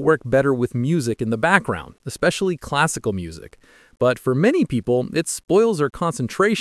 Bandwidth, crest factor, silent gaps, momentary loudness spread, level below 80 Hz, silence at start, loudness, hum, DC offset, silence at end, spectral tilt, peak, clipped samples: 12 kHz; 20 dB; none; 9 LU; -50 dBFS; 0 s; -20 LUFS; none; under 0.1%; 0 s; -5.5 dB/octave; 0 dBFS; under 0.1%